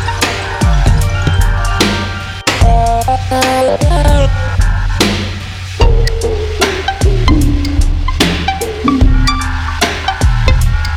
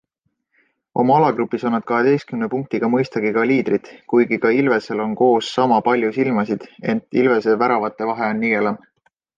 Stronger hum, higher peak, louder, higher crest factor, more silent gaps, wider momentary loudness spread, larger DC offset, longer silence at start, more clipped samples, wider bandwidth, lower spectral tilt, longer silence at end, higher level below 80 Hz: neither; first, 0 dBFS vs -4 dBFS; first, -13 LUFS vs -18 LUFS; second, 10 dB vs 16 dB; neither; about the same, 5 LU vs 7 LU; neither; second, 0 s vs 0.95 s; neither; first, 15.5 kHz vs 7.6 kHz; second, -5 dB/octave vs -7 dB/octave; second, 0 s vs 0.6 s; first, -14 dBFS vs -64 dBFS